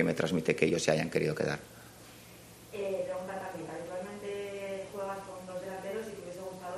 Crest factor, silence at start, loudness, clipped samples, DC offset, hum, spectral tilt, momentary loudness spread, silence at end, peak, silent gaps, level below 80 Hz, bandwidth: 24 dB; 0 s; -35 LUFS; under 0.1%; under 0.1%; none; -5 dB/octave; 22 LU; 0 s; -10 dBFS; none; -66 dBFS; 14 kHz